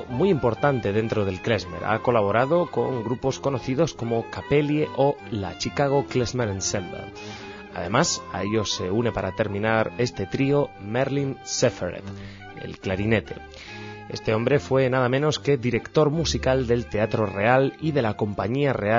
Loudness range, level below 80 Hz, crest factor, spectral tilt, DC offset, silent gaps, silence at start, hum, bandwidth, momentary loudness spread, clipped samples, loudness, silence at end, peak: 4 LU; -46 dBFS; 18 dB; -5.5 dB/octave; under 0.1%; none; 0 s; none; 7.6 kHz; 14 LU; under 0.1%; -24 LUFS; 0 s; -6 dBFS